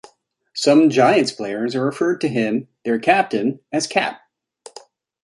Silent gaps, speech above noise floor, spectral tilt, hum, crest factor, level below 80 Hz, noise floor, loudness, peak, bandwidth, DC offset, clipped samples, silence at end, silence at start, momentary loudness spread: none; 39 dB; -5 dB/octave; none; 18 dB; -66 dBFS; -56 dBFS; -18 LUFS; -2 dBFS; 11.5 kHz; under 0.1%; under 0.1%; 1.05 s; 0.55 s; 10 LU